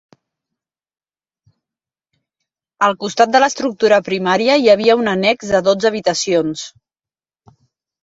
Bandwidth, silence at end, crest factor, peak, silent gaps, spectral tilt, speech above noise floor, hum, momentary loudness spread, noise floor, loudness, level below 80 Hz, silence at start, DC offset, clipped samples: 8 kHz; 1.35 s; 18 dB; 0 dBFS; none; -4 dB/octave; over 76 dB; none; 6 LU; under -90 dBFS; -15 LUFS; -58 dBFS; 2.8 s; under 0.1%; under 0.1%